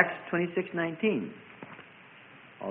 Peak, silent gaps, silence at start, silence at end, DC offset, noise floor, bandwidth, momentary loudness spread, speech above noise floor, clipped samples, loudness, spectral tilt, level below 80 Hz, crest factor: -8 dBFS; none; 0 s; 0 s; under 0.1%; -53 dBFS; 3.9 kHz; 22 LU; 23 dB; under 0.1%; -31 LUFS; -10 dB/octave; -76 dBFS; 26 dB